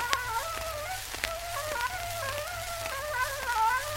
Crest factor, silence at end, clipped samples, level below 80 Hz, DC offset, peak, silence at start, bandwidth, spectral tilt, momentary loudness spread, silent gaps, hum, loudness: 30 dB; 0 s; under 0.1%; -48 dBFS; under 0.1%; -2 dBFS; 0 s; 16.5 kHz; -1.5 dB/octave; 7 LU; none; none; -32 LUFS